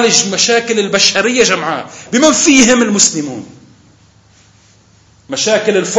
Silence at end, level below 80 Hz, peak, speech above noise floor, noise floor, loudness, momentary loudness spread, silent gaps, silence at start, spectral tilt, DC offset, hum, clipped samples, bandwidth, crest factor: 0 s; -50 dBFS; 0 dBFS; 36 dB; -47 dBFS; -10 LUFS; 14 LU; none; 0 s; -2 dB/octave; under 0.1%; none; 0.2%; 11 kHz; 14 dB